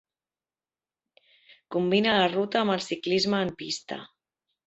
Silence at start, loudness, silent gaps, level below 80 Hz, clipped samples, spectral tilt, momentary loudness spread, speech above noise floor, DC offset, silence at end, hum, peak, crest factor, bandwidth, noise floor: 1.7 s; -26 LUFS; none; -66 dBFS; under 0.1%; -4.5 dB/octave; 11 LU; over 64 dB; under 0.1%; 0.6 s; none; -8 dBFS; 20 dB; 8.2 kHz; under -90 dBFS